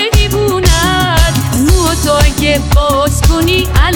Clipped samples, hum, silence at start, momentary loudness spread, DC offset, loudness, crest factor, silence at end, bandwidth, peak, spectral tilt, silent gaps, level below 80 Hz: under 0.1%; none; 0 s; 2 LU; under 0.1%; -10 LUFS; 10 dB; 0 s; over 20 kHz; 0 dBFS; -4.5 dB/octave; none; -14 dBFS